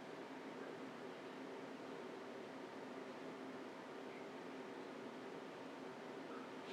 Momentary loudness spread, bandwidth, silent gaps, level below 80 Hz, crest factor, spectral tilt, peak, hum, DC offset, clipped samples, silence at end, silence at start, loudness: 1 LU; 15 kHz; none; under -90 dBFS; 12 dB; -5 dB/octave; -38 dBFS; 50 Hz at -85 dBFS; under 0.1%; under 0.1%; 0 s; 0 s; -52 LUFS